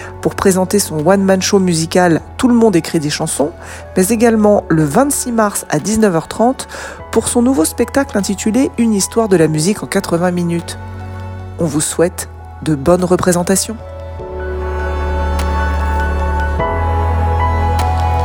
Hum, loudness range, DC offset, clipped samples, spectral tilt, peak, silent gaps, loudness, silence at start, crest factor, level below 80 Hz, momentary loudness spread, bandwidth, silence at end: none; 4 LU; under 0.1%; under 0.1%; -5 dB/octave; 0 dBFS; none; -14 LUFS; 0 s; 14 dB; -24 dBFS; 12 LU; 19 kHz; 0 s